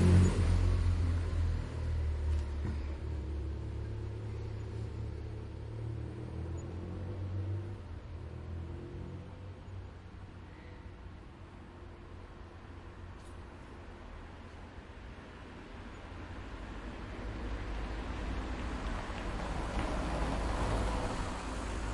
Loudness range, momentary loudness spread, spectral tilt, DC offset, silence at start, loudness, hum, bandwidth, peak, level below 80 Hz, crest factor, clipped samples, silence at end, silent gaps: 13 LU; 16 LU; -7 dB/octave; under 0.1%; 0 s; -38 LUFS; none; 11 kHz; -14 dBFS; -42 dBFS; 22 dB; under 0.1%; 0 s; none